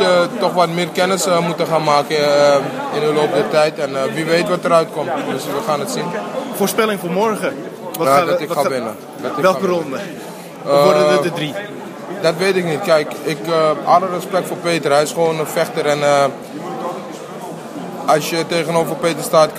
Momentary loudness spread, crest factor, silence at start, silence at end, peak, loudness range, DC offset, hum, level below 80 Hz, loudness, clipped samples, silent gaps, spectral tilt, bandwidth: 13 LU; 16 dB; 0 s; 0 s; 0 dBFS; 3 LU; under 0.1%; none; -66 dBFS; -16 LUFS; under 0.1%; none; -4.5 dB/octave; 15.5 kHz